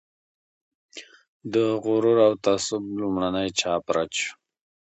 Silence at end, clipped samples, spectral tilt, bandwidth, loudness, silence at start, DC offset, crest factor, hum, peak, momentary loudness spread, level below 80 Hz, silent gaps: 0.55 s; under 0.1%; -4 dB/octave; 8.8 kHz; -24 LUFS; 0.95 s; under 0.1%; 18 dB; none; -6 dBFS; 23 LU; -60 dBFS; 1.28-1.40 s